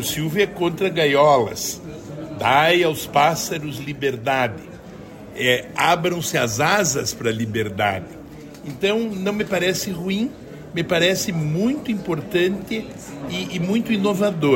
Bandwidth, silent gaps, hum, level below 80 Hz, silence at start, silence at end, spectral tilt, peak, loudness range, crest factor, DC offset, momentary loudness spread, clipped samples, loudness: 16.5 kHz; none; none; -52 dBFS; 0 s; 0 s; -4 dB/octave; -4 dBFS; 4 LU; 16 dB; under 0.1%; 17 LU; under 0.1%; -20 LUFS